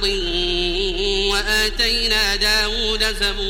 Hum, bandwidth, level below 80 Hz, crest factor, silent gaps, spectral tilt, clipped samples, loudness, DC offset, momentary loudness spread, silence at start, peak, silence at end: none; 16.5 kHz; -28 dBFS; 16 dB; none; -2 dB/octave; under 0.1%; -18 LUFS; under 0.1%; 4 LU; 0 s; -4 dBFS; 0 s